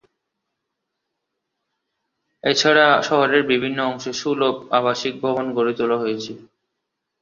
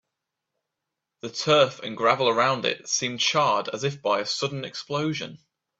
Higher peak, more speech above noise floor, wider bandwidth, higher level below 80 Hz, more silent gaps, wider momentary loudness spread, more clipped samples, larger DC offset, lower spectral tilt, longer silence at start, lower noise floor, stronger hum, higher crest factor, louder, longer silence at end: about the same, -2 dBFS vs -4 dBFS; about the same, 60 dB vs 60 dB; about the same, 7.6 kHz vs 8 kHz; about the same, -66 dBFS vs -68 dBFS; neither; about the same, 11 LU vs 12 LU; neither; neither; about the same, -3.5 dB/octave vs -3 dB/octave; first, 2.45 s vs 1.25 s; second, -79 dBFS vs -84 dBFS; neither; about the same, 20 dB vs 22 dB; first, -19 LUFS vs -24 LUFS; first, 0.85 s vs 0.45 s